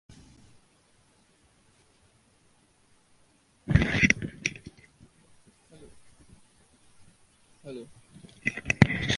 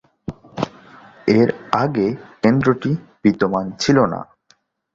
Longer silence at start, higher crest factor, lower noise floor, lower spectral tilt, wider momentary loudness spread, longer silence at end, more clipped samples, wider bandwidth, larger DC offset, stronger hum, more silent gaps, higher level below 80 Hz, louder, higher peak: second, 0.1 s vs 0.3 s; first, 32 dB vs 18 dB; first, -64 dBFS vs -59 dBFS; second, -5 dB/octave vs -6.5 dB/octave; first, 26 LU vs 12 LU; second, 0 s vs 0.7 s; neither; first, 11.5 kHz vs 7.8 kHz; neither; neither; neither; first, -46 dBFS vs -52 dBFS; second, -26 LUFS vs -19 LUFS; about the same, 0 dBFS vs -2 dBFS